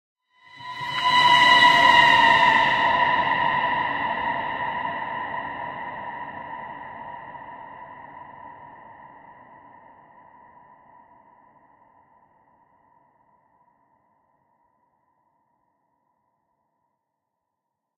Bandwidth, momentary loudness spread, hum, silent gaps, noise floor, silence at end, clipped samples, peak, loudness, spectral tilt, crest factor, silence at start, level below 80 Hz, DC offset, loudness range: 14 kHz; 27 LU; none; none; -82 dBFS; 9.3 s; under 0.1%; -4 dBFS; -18 LUFS; -2.5 dB/octave; 22 dB; 0.6 s; -62 dBFS; under 0.1%; 25 LU